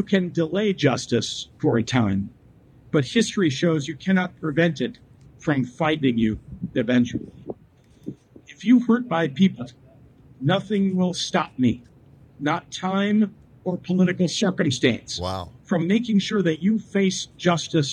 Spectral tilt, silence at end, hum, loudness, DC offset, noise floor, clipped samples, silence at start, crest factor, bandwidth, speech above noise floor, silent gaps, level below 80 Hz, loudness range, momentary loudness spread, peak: -5.5 dB/octave; 0 s; none; -23 LUFS; under 0.1%; -53 dBFS; under 0.1%; 0 s; 18 dB; 10 kHz; 32 dB; none; -56 dBFS; 2 LU; 11 LU; -4 dBFS